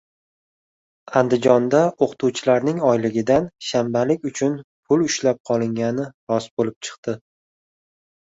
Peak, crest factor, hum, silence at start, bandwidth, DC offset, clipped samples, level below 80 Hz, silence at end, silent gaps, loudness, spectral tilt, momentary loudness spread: -2 dBFS; 20 dB; none; 1.1 s; 8 kHz; under 0.1%; under 0.1%; -58 dBFS; 1.2 s; 4.64-4.83 s, 5.40-5.44 s, 6.14-6.27 s, 6.51-6.57 s, 6.76-6.81 s, 6.98-7.03 s; -21 LUFS; -5.5 dB/octave; 10 LU